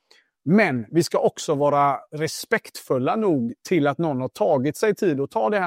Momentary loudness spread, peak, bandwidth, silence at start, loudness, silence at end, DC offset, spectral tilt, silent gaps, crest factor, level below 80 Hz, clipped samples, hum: 6 LU; -6 dBFS; 16 kHz; 0.45 s; -22 LUFS; 0 s; under 0.1%; -6 dB/octave; none; 16 dB; -68 dBFS; under 0.1%; none